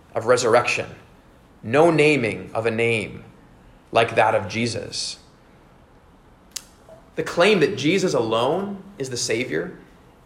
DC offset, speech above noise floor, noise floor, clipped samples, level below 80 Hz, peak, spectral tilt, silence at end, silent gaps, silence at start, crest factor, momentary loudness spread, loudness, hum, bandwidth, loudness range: under 0.1%; 31 dB; -51 dBFS; under 0.1%; -56 dBFS; -4 dBFS; -4.5 dB/octave; 0.45 s; none; 0.15 s; 18 dB; 18 LU; -21 LUFS; none; 16 kHz; 4 LU